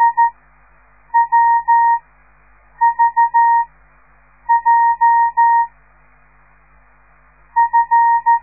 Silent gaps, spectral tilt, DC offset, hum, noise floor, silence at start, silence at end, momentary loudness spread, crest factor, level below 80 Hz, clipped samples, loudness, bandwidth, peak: none; -7 dB/octave; 0.2%; 50 Hz at -55 dBFS; -51 dBFS; 0 s; 0.05 s; 6 LU; 12 dB; -54 dBFS; under 0.1%; -14 LUFS; 2.6 kHz; -4 dBFS